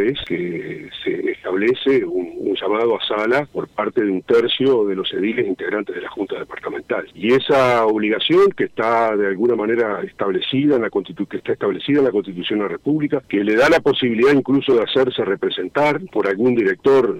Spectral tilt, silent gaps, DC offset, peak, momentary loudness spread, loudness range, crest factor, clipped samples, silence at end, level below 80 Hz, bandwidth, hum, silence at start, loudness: -6 dB/octave; none; under 0.1%; -4 dBFS; 10 LU; 3 LU; 14 dB; under 0.1%; 0 s; -56 dBFS; 10 kHz; none; 0 s; -18 LUFS